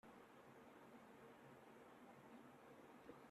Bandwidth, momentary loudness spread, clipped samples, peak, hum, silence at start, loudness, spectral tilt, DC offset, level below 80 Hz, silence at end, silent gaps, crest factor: 13.5 kHz; 2 LU; under 0.1%; -46 dBFS; none; 0.05 s; -64 LUFS; -5.5 dB/octave; under 0.1%; under -90 dBFS; 0 s; none; 18 dB